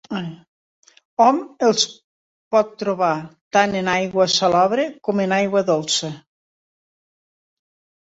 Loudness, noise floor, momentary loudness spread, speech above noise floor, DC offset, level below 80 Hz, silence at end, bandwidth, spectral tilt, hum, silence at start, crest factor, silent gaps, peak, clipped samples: -19 LUFS; under -90 dBFS; 12 LU; over 71 dB; under 0.1%; -62 dBFS; 1.9 s; 8 kHz; -3.5 dB/octave; none; 0.1 s; 20 dB; 0.48-0.83 s, 1.05-1.17 s, 2.04-2.51 s, 3.41-3.51 s; -2 dBFS; under 0.1%